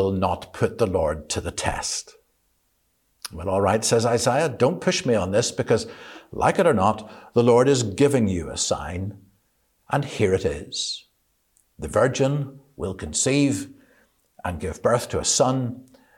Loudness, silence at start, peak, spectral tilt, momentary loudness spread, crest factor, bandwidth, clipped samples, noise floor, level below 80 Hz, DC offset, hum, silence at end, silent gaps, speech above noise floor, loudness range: -23 LUFS; 0 s; -6 dBFS; -4.5 dB/octave; 13 LU; 18 dB; 16.5 kHz; under 0.1%; -69 dBFS; -46 dBFS; under 0.1%; none; 0.35 s; none; 47 dB; 6 LU